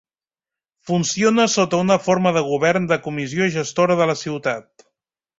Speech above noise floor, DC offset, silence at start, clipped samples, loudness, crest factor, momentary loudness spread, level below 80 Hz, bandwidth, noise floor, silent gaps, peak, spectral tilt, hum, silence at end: over 71 dB; under 0.1%; 0.85 s; under 0.1%; -19 LUFS; 18 dB; 7 LU; -58 dBFS; 8 kHz; under -90 dBFS; none; -2 dBFS; -4.5 dB/octave; none; 0.8 s